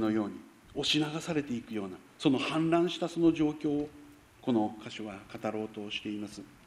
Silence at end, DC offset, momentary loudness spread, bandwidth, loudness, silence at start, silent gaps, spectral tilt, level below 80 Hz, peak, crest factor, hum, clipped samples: 0.15 s; under 0.1%; 14 LU; 12.5 kHz; -32 LUFS; 0 s; none; -5.5 dB/octave; -64 dBFS; -12 dBFS; 20 dB; none; under 0.1%